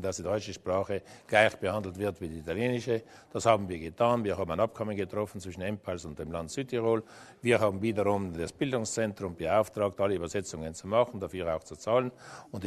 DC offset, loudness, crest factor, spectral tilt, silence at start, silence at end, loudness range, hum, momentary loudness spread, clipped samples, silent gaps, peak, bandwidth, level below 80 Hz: under 0.1%; -31 LUFS; 24 dB; -5 dB/octave; 0 s; 0 s; 2 LU; none; 11 LU; under 0.1%; none; -8 dBFS; 13.5 kHz; -58 dBFS